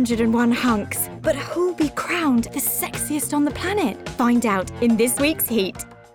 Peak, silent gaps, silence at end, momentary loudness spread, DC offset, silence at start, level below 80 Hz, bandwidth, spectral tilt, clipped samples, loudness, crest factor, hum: -8 dBFS; none; 0.2 s; 5 LU; under 0.1%; 0 s; -46 dBFS; over 20 kHz; -4 dB/octave; under 0.1%; -21 LUFS; 14 dB; none